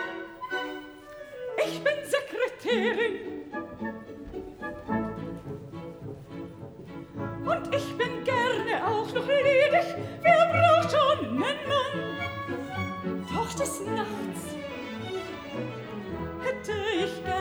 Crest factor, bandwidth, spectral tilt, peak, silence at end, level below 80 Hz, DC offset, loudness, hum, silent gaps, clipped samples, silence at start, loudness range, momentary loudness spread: 20 dB; over 20 kHz; -5 dB/octave; -8 dBFS; 0 s; -58 dBFS; under 0.1%; -28 LUFS; none; none; under 0.1%; 0 s; 12 LU; 19 LU